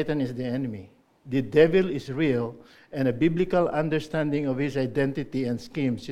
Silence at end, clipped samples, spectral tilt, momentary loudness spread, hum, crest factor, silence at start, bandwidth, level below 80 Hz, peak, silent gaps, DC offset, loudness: 0 s; under 0.1%; -7.5 dB/octave; 10 LU; none; 20 dB; 0 s; 12.5 kHz; -52 dBFS; -6 dBFS; none; under 0.1%; -26 LUFS